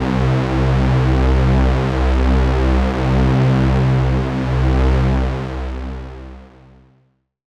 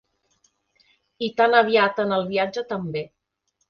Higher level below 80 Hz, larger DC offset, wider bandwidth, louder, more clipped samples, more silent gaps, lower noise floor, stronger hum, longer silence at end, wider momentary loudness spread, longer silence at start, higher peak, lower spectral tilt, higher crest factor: first, -20 dBFS vs -66 dBFS; neither; first, 7.6 kHz vs 6.8 kHz; first, -17 LUFS vs -22 LUFS; neither; neither; second, -60 dBFS vs -74 dBFS; neither; first, 1.1 s vs 0.65 s; second, 11 LU vs 14 LU; second, 0 s vs 1.2 s; second, -6 dBFS vs -2 dBFS; first, -8 dB/octave vs -6 dB/octave; second, 10 dB vs 20 dB